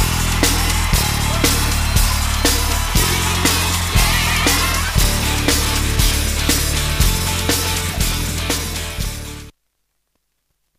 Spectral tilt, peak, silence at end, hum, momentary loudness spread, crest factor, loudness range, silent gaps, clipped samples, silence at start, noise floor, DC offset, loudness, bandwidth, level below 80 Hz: -3 dB/octave; -2 dBFS; 1.3 s; none; 6 LU; 16 dB; 4 LU; none; under 0.1%; 0 s; -70 dBFS; under 0.1%; -17 LUFS; 15.5 kHz; -22 dBFS